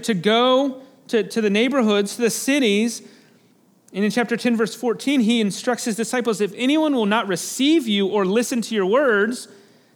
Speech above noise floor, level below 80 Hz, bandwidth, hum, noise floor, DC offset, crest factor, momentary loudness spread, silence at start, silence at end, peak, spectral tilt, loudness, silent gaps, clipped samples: 37 dB; -80 dBFS; 19 kHz; none; -57 dBFS; under 0.1%; 16 dB; 7 LU; 0 s; 0.5 s; -4 dBFS; -4 dB/octave; -20 LUFS; none; under 0.1%